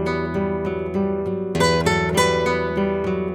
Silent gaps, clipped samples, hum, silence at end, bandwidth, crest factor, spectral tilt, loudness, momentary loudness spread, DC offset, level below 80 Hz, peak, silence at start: none; under 0.1%; none; 0 s; 17.5 kHz; 16 dB; -5 dB/octave; -21 LUFS; 6 LU; under 0.1%; -40 dBFS; -4 dBFS; 0 s